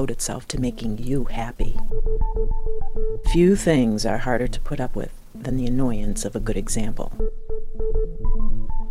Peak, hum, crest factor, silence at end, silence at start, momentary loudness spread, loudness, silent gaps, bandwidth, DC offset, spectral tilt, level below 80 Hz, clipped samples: -4 dBFS; none; 14 dB; 0 s; 0 s; 12 LU; -25 LUFS; none; 12.5 kHz; under 0.1%; -5.5 dB/octave; -24 dBFS; under 0.1%